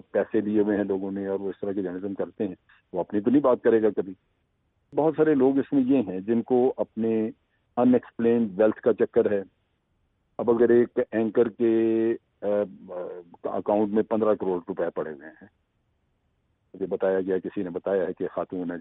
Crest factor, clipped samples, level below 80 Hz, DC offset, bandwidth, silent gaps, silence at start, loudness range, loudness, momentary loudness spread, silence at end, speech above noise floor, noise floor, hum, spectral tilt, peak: 16 dB; under 0.1%; -66 dBFS; under 0.1%; 4 kHz; none; 0.15 s; 6 LU; -25 LUFS; 12 LU; 0 s; 47 dB; -72 dBFS; none; -7.5 dB/octave; -10 dBFS